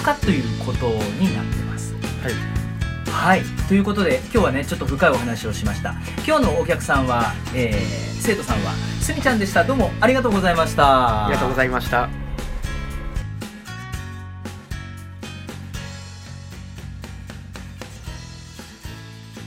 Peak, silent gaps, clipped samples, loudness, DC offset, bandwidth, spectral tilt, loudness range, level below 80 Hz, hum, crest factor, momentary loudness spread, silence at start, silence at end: 0 dBFS; none; under 0.1%; -21 LUFS; under 0.1%; 16 kHz; -5.5 dB/octave; 16 LU; -32 dBFS; none; 22 dB; 18 LU; 0 s; 0 s